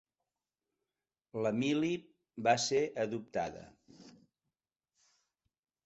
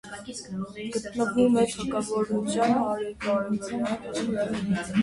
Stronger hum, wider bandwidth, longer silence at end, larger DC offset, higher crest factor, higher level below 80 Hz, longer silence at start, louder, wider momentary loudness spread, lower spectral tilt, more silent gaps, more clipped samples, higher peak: neither; second, 8 kHz vs 11.5 kHz; first, 1.75 s vs 0 s; neither; first, 24 dB vs 16 dB; second, -74 dBFS vs -56 dBFS; first, 1.35 s vs 0.05 s; second, -34 LUFS vs -27 LUFS; about the same, 14 LU vs 12 LU; second, -4 dB/octave vs -5.5 dB/octave; neither; neither; second, -14 dBFS vs -10 dBFS